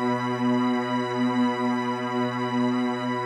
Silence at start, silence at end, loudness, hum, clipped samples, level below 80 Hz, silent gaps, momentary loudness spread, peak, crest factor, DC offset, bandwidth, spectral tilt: 0 s; 0 s; -25 LUFS; none; under 0.1%; -76 dBFS; none; 3 LU; -12 dBFS; 12 dB; under 0.1%; 9.4 kHz; -6.5 dB/octave